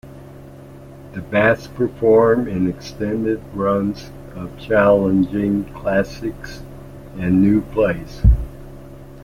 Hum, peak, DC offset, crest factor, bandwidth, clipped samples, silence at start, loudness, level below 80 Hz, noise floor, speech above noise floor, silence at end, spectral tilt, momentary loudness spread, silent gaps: none; -2 dBFS; under 0.1%; 16 dB; 15.5 kHz; under 0.1%; 0.05 s; -18 LUFS; -28 dBFS; -38 dBFS; 21 dB; 0 s; -8 dB/octave; 25 LU; none